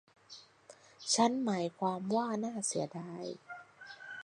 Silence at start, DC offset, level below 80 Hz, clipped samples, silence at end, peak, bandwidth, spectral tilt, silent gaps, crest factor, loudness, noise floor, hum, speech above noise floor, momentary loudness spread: 0.3 s; under 0.1%; -82 dBFS; under 0.1%; 0 s; -14 dBFS; 11 kHz; -3.5 dB/octave; none; 22 dB; -34 LUFS; -60 dBFS; none; 26 dB; 23 LU